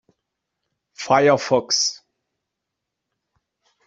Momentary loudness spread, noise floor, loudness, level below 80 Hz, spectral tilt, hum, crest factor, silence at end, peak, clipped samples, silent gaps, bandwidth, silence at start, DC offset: 7 LU; -82 dBFS; -18 LUFS; -66 dBFS; -3 dB/octave; none; 22 dB; 1.9 s; -2 dBFS; under 0.1%; none; 8.2 kHz; 1 s; under 0.1%